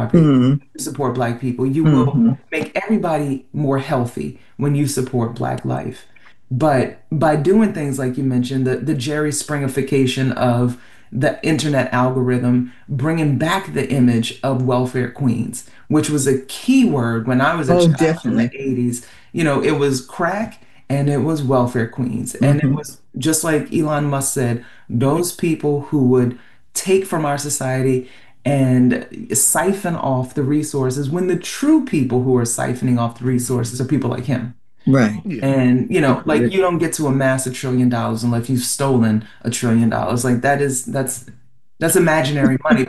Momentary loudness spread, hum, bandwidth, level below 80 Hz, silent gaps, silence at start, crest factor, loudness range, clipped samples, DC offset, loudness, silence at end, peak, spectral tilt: 8 LU; none; 12.5 kHz; -50 dBFS; none; 0 s; 16 dB; 2 LU; under 0.1%; 0.8%; -18 LUFS; 0.05 s; -2 dBFS; -5.5 dB/octave